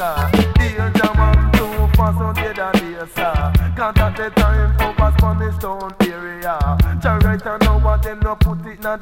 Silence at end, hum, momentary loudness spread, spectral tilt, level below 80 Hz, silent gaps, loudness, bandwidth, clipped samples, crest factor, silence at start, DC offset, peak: 0 s; none; 7 LU; -7 dB/octave; -20 dBFS; none; -17 LUFS; 17 kHz; under 0.1%; 16 dB; 0 s; under 0.1%; 0 dBFS